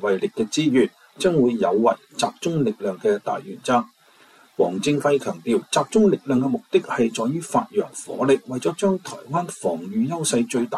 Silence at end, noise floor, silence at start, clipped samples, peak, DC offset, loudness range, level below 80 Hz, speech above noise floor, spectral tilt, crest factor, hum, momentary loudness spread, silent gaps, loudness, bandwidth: 0 s; -53 dBFS; 0 s; under 0.1%; -6 dBFS; under 0.1%; 2 LU; -62 dBFS; 32 dB; -5 dB/octave; 16 dB; none; 8 LU; none; -22 LUFS; 14 kHz